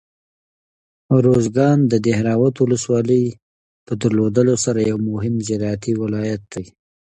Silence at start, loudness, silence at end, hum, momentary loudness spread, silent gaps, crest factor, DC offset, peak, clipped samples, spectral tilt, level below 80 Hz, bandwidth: 1.1 s; -18 LUFS; 0.35 s; none; 9 LU; 3.42-3.86 s; 16 dB; under 0.1%; -2 dBFS; under 0.1%; -6.5 dB/octave; -50 dBFS; 11 kHz